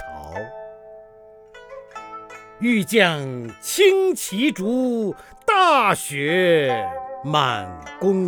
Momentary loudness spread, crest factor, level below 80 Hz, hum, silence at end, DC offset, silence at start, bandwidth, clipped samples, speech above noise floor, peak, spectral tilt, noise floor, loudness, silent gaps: 21 LU; 18 dB; -56 dBFS; 50 Hz at -50 dBFS; 0 s; under 0.1%; 0 s; over 20 kHz; under 0.1%; 27 dB; -2 dBFS; -4 dB/octave; -46 dBFS; -20 LUFS; none